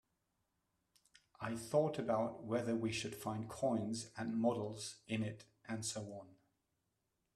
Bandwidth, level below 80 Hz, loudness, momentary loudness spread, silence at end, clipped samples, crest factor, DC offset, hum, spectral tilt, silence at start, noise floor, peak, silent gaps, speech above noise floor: 14 kHz; -74 dBFS; -40 LUFS; 11 LU; 1 s; under 0.1%; 20 dB; under 0.1%; none; -5 dB/octave; 1.4 s; -85 dBFS; -22 dBFS; none; 46 dB